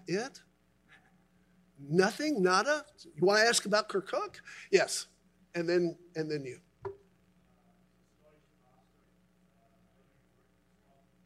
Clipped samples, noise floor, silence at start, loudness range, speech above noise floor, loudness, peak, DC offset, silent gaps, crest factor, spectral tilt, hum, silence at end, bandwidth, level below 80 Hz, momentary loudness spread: under 0.1%; -69 dBFS; 0.1 s; 11 LU; 39 dB; -30 LUFS; -10 dBFS; under 0.1%; none; 24 dB; -3.5 dB/octave; none; 4.3 s; 14.5 kHz; -76 dBFS; 21 LU